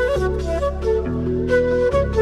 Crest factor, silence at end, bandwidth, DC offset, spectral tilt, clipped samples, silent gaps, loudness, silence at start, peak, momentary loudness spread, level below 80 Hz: 12 dB; 0 s; 12 kHz; under 0.1%; -7.5 dB/octave; under 0.1%; none; -20 LUFS; 0 s; -6 dBFS; 4 LU; -28 dBFS